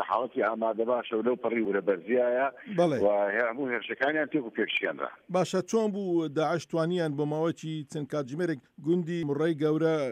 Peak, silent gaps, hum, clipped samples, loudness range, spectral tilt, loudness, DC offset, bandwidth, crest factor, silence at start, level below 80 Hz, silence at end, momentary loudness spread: -12 dBFS; none; none; under 0.1%; 3 LU; -6 dB/octave; -29 LUFS; under 0.1%; 11.5 kHz; 16 dB; 0 s; -74 dBFS; 0 s; 6 LU